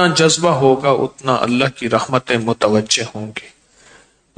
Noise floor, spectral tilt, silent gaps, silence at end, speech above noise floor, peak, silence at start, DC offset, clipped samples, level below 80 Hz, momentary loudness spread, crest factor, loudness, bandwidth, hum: -49 dBFS; -4 dB/octave; none; 0.9 s; 33 dB; 0 dBFS; 0 s; under 0.1%; under 0.1%; -54 dBFS; 11 LU; 16 dB; -16 LUFS; 9.4 kHz; none